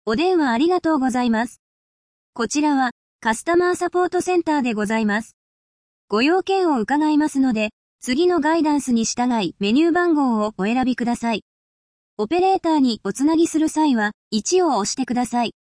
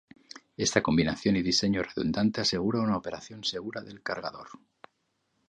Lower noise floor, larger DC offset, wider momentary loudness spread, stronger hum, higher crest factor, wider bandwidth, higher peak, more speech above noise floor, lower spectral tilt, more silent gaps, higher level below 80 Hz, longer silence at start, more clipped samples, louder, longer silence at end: first, under -90 dBFS vs -76 dBFS; neither; second, 6 LU vs 14 LU; neither; second, 14 dB vs 24 dB; about the same, 10.5 kHz vs 11 kHz; about the same, -6 dBFS vs -6 dBFS; first, over 71 dB vs 47 dB; about the same, -4 dB/octave vs -4.5 dB/octave; first, 1.59-2.33 s, 2.91-3.19 s, 5.33-6.08 s, 7.73-7.99 s, 11.42-12.17 s, 14.14-14.31 s vs none; about the same, -56 dBFS vs -54 dBFS; second, 0.05 s vs 0.6 s; neither; first, -20 LUFS vs -28 LUFS; second, 0.2 s vs 0.95 s